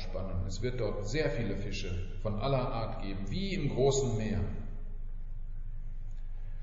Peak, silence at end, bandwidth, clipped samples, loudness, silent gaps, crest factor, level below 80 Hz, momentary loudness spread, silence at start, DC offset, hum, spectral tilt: -16 dBFS; 0 s; 7.6 kHz; under 0.1%; -34 LUFS; none; 16 dB; -36 dBFS; 17 LU; 0 s; under 0.1%; none; -6 dB/octave